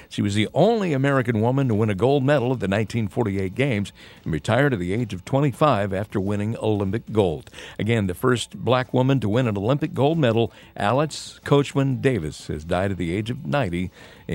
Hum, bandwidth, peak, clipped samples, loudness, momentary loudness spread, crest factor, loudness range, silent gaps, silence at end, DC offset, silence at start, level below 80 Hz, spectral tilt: none; 16 kHz; -4 dBFS; under 0.1%; -22 LUFS; 8 LU; 18 dB; 2 LU; none; 0 s; under 0.1%; 0 s; -50 dBFS; -7 dB/octave